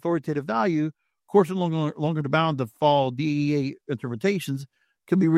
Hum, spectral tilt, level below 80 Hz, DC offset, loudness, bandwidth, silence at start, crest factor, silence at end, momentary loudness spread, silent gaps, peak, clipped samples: none; -7.5 dB/octave; -68 dBFS; under 0.1%; -25 LUFS; 14.5 kHz; 0.05 s; 18 dB; 0 s; 9 LU; none; -6 dBFS; under 0.1%